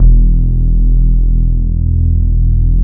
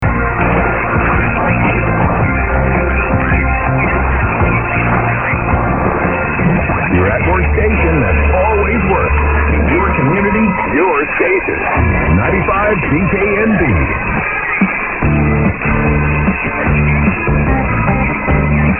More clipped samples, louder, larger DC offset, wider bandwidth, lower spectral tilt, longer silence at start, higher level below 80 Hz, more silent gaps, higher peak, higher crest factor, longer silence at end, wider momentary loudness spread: neither; about the same, -14 LUFS vs -13 LUFS; neither; second, 0.7 kHz vs 3.3 kHz; first, -17 dB/octave vs -11 dB/octave; about the same, 0 s vs 0 s; first, -8 dBFS vs -20 dBFS; neither; about the same, 0 dBFS vs 0 dBFS; about the same, 8 dB vs 12 dB; about the same, 0 s vs 0 s; about the same, 3 LU vs 2 LU